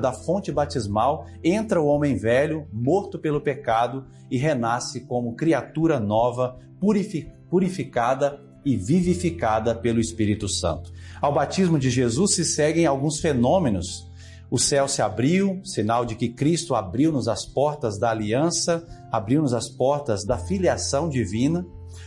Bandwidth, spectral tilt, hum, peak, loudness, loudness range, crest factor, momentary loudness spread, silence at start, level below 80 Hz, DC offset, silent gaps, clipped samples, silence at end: 11.5 kHz; -5 dB/octave; none; -8 dBFS; -23 LUFS; 2 LU; 14 dB; 8 LU; 0 s; -50 dBFS; under 0.1%; none; under 0.1%; 0 s